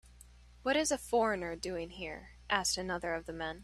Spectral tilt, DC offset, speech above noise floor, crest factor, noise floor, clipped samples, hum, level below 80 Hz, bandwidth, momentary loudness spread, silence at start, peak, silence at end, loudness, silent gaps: -2.5 dB/octave; under 0.1%; 23 dB; 22 dB; -57 dBFS; under 0.1%; 60 Hz at -55 dBFS; -56 dBFS; 14.5 kHz; 11 LU; 0.05 s; -14 dBFS; 0 s; -34 LUFS; none